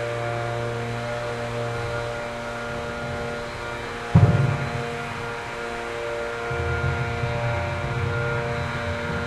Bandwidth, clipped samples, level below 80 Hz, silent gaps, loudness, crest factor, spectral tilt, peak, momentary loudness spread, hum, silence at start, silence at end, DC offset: 12.5 kHz; under 0.1%; -44 dBFS; none; -26 LUFS; 22 dB; -6.5 dB/octave; -4 dBFS; 9 LU; none; 0 s; 0 s; under 0.1%